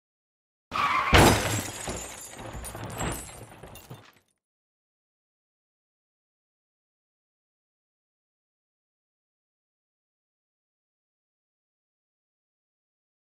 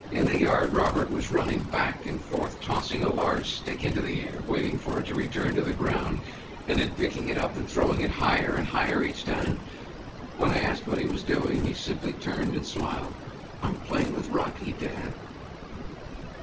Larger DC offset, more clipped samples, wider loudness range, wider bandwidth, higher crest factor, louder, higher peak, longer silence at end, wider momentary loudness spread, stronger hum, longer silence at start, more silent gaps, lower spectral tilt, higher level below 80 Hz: neither; neither; first, 15 LU vs 4 LU; first, 16 kHz vs 8 kHz; first, 30 dB vs 20 dB; first, -24 LUFS vs -28 LUFS; first, -4 dBFS vs -8 dBFS; first, 9.3 s vs 0 s; first, 27 LU vs 15 LU; neither; first, 0.7 s vs 0 s; neither; second, -4 dB/octave vs -6 dB/octave; about the same, -44 dBFS vs -40 dBFS